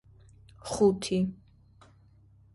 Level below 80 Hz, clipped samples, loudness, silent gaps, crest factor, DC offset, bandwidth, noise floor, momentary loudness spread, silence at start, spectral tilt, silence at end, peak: -58 dBFS; under 0.1%; -28 LUFS; none; 20 dB; under 0.1%; 11.5 kHz; -59 dBFS; 13 LU; 0.65 s; -6 dB/octave; 1.2 s; -12 dBFS